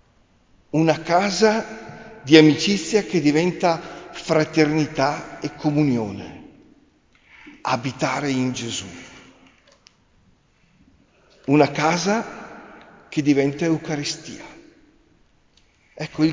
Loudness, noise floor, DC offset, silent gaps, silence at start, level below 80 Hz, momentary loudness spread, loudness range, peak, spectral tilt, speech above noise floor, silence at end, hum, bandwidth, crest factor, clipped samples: -20 LUFS; -59 dBFS; under 0.1%; none; 0.75 s; -58 dBFS; 20 LU; 9 LU; 0 dBFS; -5 dB/octave; 39 dB; 0 s; none; 7.6 kHz; 22 dB; under 0.1%